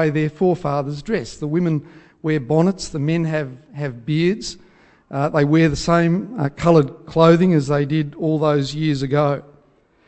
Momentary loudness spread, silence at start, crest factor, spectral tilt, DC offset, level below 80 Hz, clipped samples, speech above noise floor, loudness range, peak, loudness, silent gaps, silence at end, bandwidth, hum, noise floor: 11 LU; 0 s; 18 dB; -7 dB/octave; under 0.1%; -46 dBFS; under 0.1%; 38 dB; 5 LU; -2 dBFS; -19 LUFS; none; 0.65 s; 8.6 kHz; none; -56 dBFS